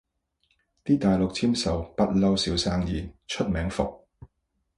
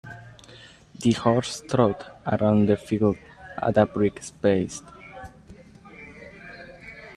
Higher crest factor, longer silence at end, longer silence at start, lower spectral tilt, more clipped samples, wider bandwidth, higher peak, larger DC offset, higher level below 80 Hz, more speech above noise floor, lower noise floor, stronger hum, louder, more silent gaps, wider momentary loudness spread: about the same, 18 dB vs 22 dB; first, 0.55 s vs 0.05 s; first, 0.85 s vs 0.05 s; about the same, -5.5 dB/octave vs -6.5 dB/octave; neither; about the same, 11.5 kHz vs 12 kHz; second, -8 dBFS vs -4 dBFS; neither; first, -42 dBFS vs -54 dBFS; first, 51 dB vs 26 dB; first, -76 dBFS vs -49 dBFS; neither; about the same, -26 LUFS vs -24 LUFS; neither; second, 9 LU vs 22 LU